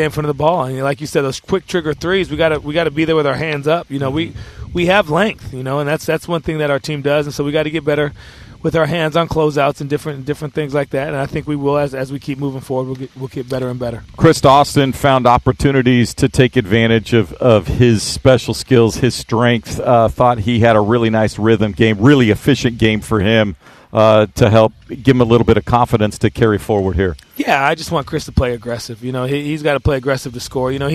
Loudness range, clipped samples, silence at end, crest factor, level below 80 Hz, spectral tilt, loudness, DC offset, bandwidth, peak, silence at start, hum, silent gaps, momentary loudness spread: 5 LU; under 0.1%; 0 s; 14 dB; -34 dBFS; -6 dB/octave; -15 LUFS; under 0.1%; 14.5 kHz; 0 dBFS; 0 s; none; none; 10 LU